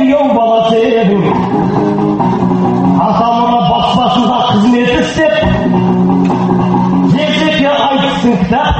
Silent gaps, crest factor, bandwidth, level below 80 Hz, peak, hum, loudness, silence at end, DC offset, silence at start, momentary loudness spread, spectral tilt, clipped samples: none; 10 dB; 8.4 kHz; -32 dBFS; 0 dBFS; none; -10 LUFS; 0 s; under 0.1%; 0 s; 2 LU; -7 dB/octave; under 0.1%